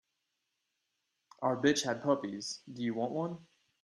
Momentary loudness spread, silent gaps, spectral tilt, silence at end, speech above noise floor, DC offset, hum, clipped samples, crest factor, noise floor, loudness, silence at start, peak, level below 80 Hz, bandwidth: 11 LU; none; -4.5 dB/octave; 0.4 s; 50 dB; under 0.1%; none; under 0.1%; 22 dB; -84 dBFS; -34 LUFS; 1.4 s; -14 dBFS; -76 dBFS; 13 kHz